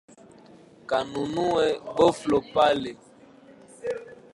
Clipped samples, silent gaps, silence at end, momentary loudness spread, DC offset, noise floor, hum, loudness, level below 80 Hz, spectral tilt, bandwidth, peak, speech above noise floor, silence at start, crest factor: under 0.1%; none; 0.2 s; 15 LU; under 0.1%; -51 dBFS; none; -25 LUFS; -58 dBFS; -5 dB/octave; 11.5 kHz; -6 dBFS; 28 dB; 0.9 s; 20 dB